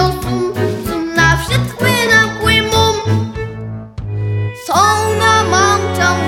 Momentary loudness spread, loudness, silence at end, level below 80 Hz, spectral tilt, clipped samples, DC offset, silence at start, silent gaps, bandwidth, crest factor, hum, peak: 13 LU; -13 LUFS; 0 s; -32 dBFS; -4 dB/octave; under 0.1%; under 0.1%; 0 s; none; 17 kHz; 14 dB; none; 0 dBFS